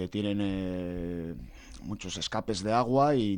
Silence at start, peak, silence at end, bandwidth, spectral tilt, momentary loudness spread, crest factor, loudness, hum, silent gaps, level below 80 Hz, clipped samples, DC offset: 0 s; -14 dBFS; 0 s; 17.5 kHz; -6 dB/octave; 16 LU; 16 dB; -30 LUFS; none; none; -50 dBFS; under 0.1%; under 0.1%